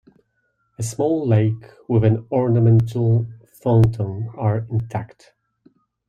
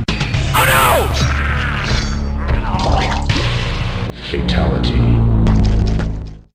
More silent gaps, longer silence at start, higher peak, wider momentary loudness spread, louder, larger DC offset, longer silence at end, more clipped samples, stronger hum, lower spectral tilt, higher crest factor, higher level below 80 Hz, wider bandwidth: neither; first, 0.8 s vs 0 s; second, -4 dBFS vs 0 dBFS; first, 13 LU vs 9 LU; second, -20 LUFS vs -16 LUFS; neither; first, 1 s vs 0.15 s; neither; neither; first, -8.5 dB/octave vs -5 dB/octave; about the same, 16 dB vs 14 dB; second, -48 dBFS vs -20 dBFS; second, 10.5 kHz vs 15.5 kHz